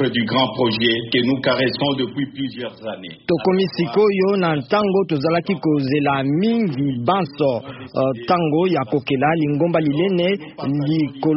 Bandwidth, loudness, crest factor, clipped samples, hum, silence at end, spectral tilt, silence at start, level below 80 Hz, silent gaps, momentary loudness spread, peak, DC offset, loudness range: 5.8 kHz; -19 LUFS; 16 dB; under 0.1%; none; 0 s; -4.5 dB/octave; 0 s; -56 dBFS; none; 7 LU; -4 dBFS; under 0.1%; 2 LU